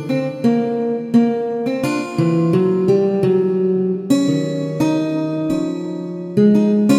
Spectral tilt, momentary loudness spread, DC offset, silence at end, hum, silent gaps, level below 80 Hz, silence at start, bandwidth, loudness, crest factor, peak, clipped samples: -7.5 dB/octave; 7 LU; under 0.1%; 0 s; none; none; -58 dBFS; 0 s; 14.5 kHz; -17 LUFS; 14 dB; -2 dBFS; under 0.1%